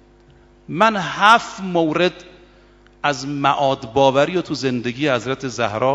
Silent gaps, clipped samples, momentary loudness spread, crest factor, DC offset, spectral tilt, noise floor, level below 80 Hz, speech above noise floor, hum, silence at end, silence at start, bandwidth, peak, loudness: none; under 0.1%; 9 LU; 20 dB; under 0.1%; -5 dB/octave; -49 dBFS; -54 dBFS; 31 dB; 50 Hz at -50 dBFS; 0 s; 0.7 s; 11 kHz; 0 dBFS; -18 LUFS